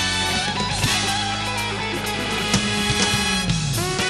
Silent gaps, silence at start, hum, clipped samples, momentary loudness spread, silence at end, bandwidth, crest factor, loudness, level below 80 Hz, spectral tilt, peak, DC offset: none; 0 s; none; under 0.1%; 5 LU; 0 s; 13 kHz; 18 dB; -21 LUFS; -38 dBFS; -3 dB/octave; -4 dBFS; under 0.1%